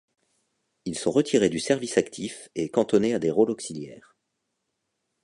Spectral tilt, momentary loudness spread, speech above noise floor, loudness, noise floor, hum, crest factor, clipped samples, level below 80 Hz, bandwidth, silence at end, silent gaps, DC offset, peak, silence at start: -5 dB/octave; 13 LU; 54 dB; -25 LUFS; -79 dBFS; none; 22 dB; under 0.1%; -62 dBFS; 11.5 kHz; 1.25 s; none; under 0.1%; -6 dBFS; 0.85 s